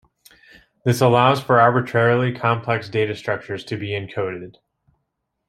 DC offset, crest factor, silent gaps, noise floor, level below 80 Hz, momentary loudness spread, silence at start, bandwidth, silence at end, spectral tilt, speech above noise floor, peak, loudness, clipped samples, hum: under 0.1%; 20 dB; none; -76 dBFS; -60 dBFS; 12 LU; 0.85 s; 14 kHz; 1 s; -6.5 dB/octave; 57 dB; -2 dBFS; -19 LUFS; under 0.1%; none